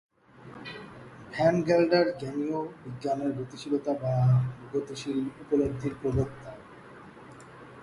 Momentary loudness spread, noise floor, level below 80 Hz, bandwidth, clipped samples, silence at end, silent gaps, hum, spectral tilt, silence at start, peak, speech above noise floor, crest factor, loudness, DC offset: 24 LU; -49 dBFS; -54 dBFS; 11.5 kHz; under 0.1%; 0 s; none; none; -7.5 dB/octave; 0.4 s; -10 dBFS; 22 dB; 18 dB; -28 LUFS; under 0.1%